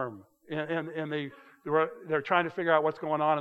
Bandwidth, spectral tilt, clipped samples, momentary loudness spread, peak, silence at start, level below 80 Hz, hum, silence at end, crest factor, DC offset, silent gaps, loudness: 6.8 kHz; -7.5 dB/octave; under 0.1%; 12 LU; -10 dBFS; 0 s; -82 dBFS; none; 0 s; 20 dB; under 0.1%; none; -30 LUFS